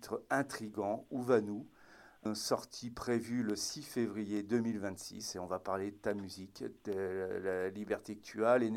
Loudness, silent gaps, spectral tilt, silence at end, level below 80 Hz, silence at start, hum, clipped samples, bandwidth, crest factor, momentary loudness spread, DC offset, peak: -38 LUFS; none; -4.5 dB/octave; 0 s; -70 dBFS; 0 s; none; under 0.1%; 16.5 kHz; 22 dB; 12 LU; under 0.1%; -16 dBFS